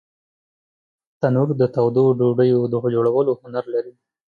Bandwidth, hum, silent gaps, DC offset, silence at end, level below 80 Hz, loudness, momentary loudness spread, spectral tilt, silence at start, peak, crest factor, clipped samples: 4.8 kHz; none; none; under 0.1%; 0.45 s; -64 dBFS; -19 LUFS; 9 LU; -10.5 dB/octave; 1.2 s; -6 dBFS; 16 dB; under 0.1%